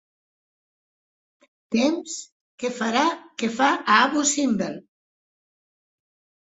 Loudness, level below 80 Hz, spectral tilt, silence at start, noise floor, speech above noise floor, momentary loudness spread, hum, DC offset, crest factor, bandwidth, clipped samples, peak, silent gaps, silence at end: -22 LUFS; -70 dBFS; -2.5 dB/octave; 1.7 s; under -90 dBFS; over 68 dB; 14 LU; none; under 0.1%; 24 dB; 8.4 kHz; under 0.1%; -2 dBFS; 2.32-2.58 s; 1.7 s